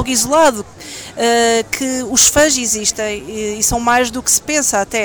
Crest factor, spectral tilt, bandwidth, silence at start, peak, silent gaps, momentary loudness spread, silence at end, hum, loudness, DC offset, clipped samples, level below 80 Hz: 14 dB; -1.5 dB/octave; over 20 kHz; 0 s; -2 dBFS; none; 12 LU; 0 s; none; -13 LUFS; under 0.1%; under 0.1%; -38 dBFS